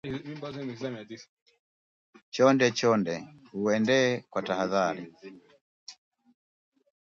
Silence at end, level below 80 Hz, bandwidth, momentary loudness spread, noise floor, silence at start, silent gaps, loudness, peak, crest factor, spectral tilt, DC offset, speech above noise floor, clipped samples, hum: 1.15 s; -70 dBFS; 7.6 kHz; 23 LU; under -90 dBFS; 0.05 s; 1.29-1.46 s, 1.59-2.13 s, 2.23-2.32 s, 5.61-5.87 s; -27 LUFS; -8 dBFS; 22 dB; -5 dB/octave; under 0.1%; over 62 dB; under 0.1%; none